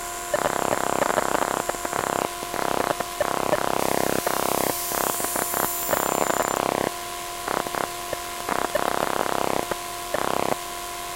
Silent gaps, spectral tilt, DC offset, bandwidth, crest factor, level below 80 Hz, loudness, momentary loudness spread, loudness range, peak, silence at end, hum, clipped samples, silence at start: none; -2.5 dB/octave; under 0.1%; 16 kHz; 22 dB; -50 dBFS; -25 LUFS; 6 LU; 3 LU; -4 dBFS; 0 s; none; under 0.1%; 0 s